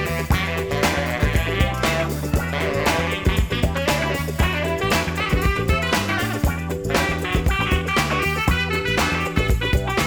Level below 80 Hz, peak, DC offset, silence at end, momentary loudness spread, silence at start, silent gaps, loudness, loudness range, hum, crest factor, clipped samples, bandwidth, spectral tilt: -28 dBFS; -4 dBFS; 0.2%; 0 s; 3 LU; 0 s; none; -21 LUFS; 1 LU; none; 16 dB; under 0.1%; over 20 kHz; -5 dB/octave